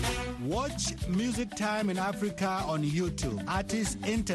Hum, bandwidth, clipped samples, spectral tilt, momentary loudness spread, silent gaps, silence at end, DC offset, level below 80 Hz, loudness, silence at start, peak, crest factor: none; 12.5 kHz; under 0.1%; -4.5 dB/octave; 3 LU; none; 0 s; under 0.1%; -44 dBFS; -31 LUFS; 0 s; -16 dBFS; 14 dB